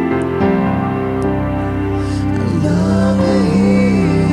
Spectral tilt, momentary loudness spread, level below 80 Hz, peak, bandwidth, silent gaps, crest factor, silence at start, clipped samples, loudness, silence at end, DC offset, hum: -8 dB/octave; 6 LU; -30 dBFS; -2 dBFS; 10.5 kHz; none; 12 dB; 0 s; under 0.1%; -15 LUFS; 0 s; under 0.1%; none